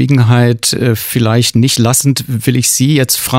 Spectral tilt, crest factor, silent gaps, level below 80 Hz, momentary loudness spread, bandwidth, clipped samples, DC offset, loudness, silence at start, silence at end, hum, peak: -4.5 dB/octave; 10 dB; none; -44 dBFS; 4 LU; 16.5 kHz; under 0.1%; under 0.1%; -11 LUFS; 0 s; 0 s; none; 0 dBFS